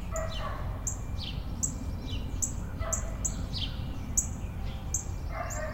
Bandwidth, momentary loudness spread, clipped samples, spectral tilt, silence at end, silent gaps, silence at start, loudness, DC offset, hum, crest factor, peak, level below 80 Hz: 16 kHz; 7 LU; under 0.1%; -3.5 dB/octave; 0 s; none; 0 s; -34 LUFS; under 0.1%; none; 22 dB; -12 dBFS; -38 dBFS